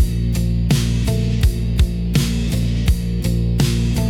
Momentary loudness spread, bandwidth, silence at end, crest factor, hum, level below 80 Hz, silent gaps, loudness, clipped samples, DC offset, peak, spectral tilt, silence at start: 2 LU; 17 kHz; 0 s; 12 dB; none; -20 dBFS; none; -19 LUFS; under 0.1%; under 0.1%; -6 dBFS; -6 dB/octave; 0 s